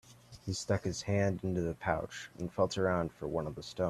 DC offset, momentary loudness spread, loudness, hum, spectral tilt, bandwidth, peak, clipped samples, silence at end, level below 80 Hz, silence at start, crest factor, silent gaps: under 0.1%; 10 LU; -35 LUFS; none; -5.5 dB/octave; 13 kHz; -14 dBFS; under 0.1%; 0 s; -58 dBFS; 0.05 s; 20 dB; none